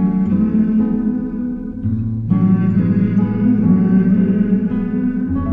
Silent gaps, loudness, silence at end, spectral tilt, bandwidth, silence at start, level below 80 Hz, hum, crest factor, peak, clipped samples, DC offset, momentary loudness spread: none; -16 LUFS; 0 s; -12.5 dB/octave; 3 kHz; 0 s; -36 dBFS; none; 12 dB; -2 dBFS; under 0.1%; under 0.1%; 8 LU